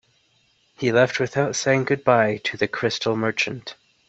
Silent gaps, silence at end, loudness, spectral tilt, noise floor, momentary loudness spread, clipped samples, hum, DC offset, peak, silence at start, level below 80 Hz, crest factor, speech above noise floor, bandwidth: none; 0.35 s; -21 LUFS; -4.5 dB/octave; -63 dBFS; 7 LU; under 0.1%; none; under 0.1%; -2 dBFS; 0.8 s; -62 dBFS; 20 dB; 42 dB; 8.2 kHz